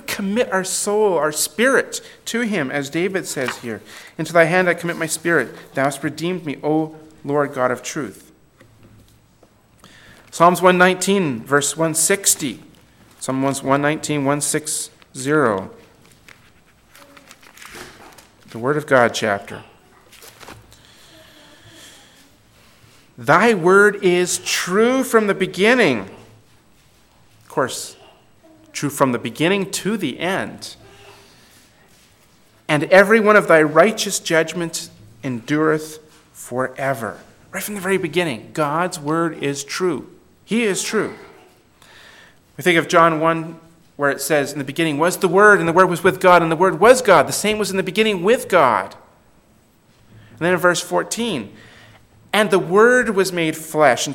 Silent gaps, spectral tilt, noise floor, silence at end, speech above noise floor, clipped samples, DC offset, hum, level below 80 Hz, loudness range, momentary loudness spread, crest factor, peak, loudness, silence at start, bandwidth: none; -4 dB/octave; -55 dBFS; 0 s; 37 dB; under 0.1%; under 0.1%; none; -60 dBFS; 9 LU; 16 LU; 20 dB; 0 dBFS; -17 LUFS; 0.1 s; 17.5 kHz